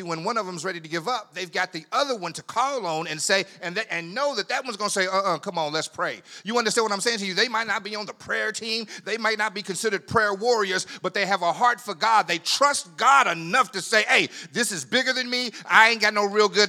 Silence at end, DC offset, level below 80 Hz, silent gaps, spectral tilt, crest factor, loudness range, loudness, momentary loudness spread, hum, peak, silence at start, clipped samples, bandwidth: 0 s; under 0.1%; -74 dBFS; none; -2 dB/octave; 24 dB; 6 LU; -23 LUFS; 10 LU; none; 0 dBFS; 0 s; under 0.1%; 18 kHz